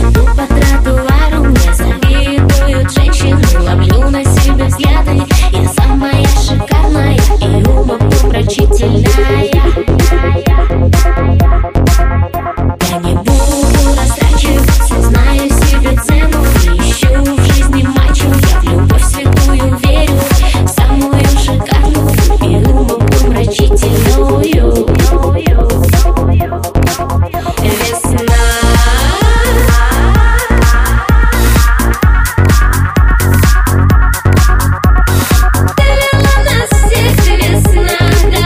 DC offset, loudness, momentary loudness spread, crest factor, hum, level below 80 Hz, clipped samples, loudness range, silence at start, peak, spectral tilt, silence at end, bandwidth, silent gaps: under 0.1%; -10 LUFS; 2 LU; 8 dB; none; -10 dBFS; under 0.1%; 1 LU; 0 s; 0 dBFS; -5.5 dB/octave; 0 s; 16 kHz; none